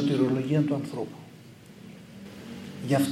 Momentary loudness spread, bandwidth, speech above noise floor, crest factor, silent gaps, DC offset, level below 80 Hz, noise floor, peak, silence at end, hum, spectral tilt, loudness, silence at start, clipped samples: 23 LU; 15.5 kHz; 23 dB; 16 dB; none; under 0.1%; -68 dBFS; -49 dBFS; -12 dBFS; 0 s; none; -7 dB/octave; -28 LUFS; 0 s; under 0.1%